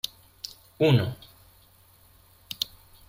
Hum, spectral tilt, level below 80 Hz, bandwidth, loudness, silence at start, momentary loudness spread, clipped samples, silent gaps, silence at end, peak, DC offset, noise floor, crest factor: none; -6 dB/octave; -60 dBFS; 16.5 kHz; -26 LUFS; 0.8 s; 19 LU; under 0.1%; none; 0.45 s; -8 dBFS; under 0.1%; -57 dBFS; 22 dB